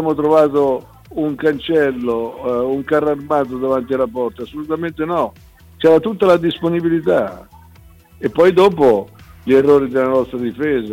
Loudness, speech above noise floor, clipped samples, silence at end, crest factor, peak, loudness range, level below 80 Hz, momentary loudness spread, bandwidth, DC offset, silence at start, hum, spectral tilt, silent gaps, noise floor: -16 LUFS; 29 dB; under 0.1%; 0 s; 12 dB; -4 dBFS; 4 LU; -48 dBFS; 12 LU; 16.5 kHz; under 0.1%; 0 s; none; -7 dB/octave; none; -44 dBFS